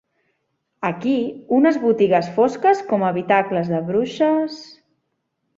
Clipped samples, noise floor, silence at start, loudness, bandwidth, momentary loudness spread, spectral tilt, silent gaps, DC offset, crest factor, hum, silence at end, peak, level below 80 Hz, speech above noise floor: under 0.1%; -73 dBFS; 0.8 s; -19 LUFS; 7.8 kHz; 7 LU; -7 dB/octave; none; under 0.1%; 18 dB; none; 0.95 s; -2 dBFS; -64 dBFS; 55 dB